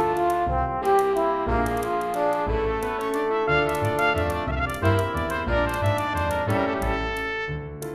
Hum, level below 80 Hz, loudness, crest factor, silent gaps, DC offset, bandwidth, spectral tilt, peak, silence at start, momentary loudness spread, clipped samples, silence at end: none; -36 dBFS; -24 LUFS; 16 dB; none; under 0.1%; 14 kHz; -6 dB/octave; -8 dBFS; 0 s; 5 LU; under 0.1%; 0 s